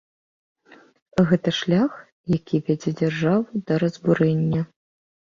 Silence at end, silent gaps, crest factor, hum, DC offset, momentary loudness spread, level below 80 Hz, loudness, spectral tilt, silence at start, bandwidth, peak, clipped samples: 0.65 s; 2.12-2.24 s; 18 dB; none; under 0.1%; 7 LU; -56 dBFS; -22 LUFS; -7.5 dB/octave; 1.15 s; 7.4 kHz; -4 dBFS; under 0.1%